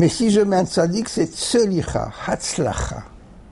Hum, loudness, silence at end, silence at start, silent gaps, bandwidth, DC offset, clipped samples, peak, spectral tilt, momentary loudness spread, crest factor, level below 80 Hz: none; -20 LUFS; 0 s; 0 s; none; 11.5 kHz; under 0.1%; under 0.1%; -6 dBFS; -5 dB/octave; 9 LU; 14 dB; -38 dBFS